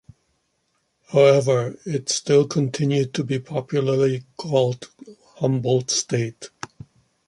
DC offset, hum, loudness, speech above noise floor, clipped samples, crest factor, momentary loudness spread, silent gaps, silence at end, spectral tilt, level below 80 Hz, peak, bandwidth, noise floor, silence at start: under 0.1%; none; -21 LUFS; 50 dB; under 0.1%; 18 dB; 15 LU; none; 0.6 s; -5 dB/octave; -62 dBFS; -4 dBFS; 11.5 kHz; -70 dBFS; 1.1 s